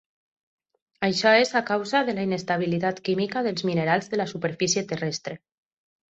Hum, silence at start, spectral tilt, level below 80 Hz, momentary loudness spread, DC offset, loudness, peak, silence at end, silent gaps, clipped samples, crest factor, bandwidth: none; 1 s; -4 dB/octave; -66 dBFS; 10 LU; under 0.1%; -24 LUFS; -6 dBFS; 0.75 s; none; under 0.1%; 20 dB; 8.2 kHz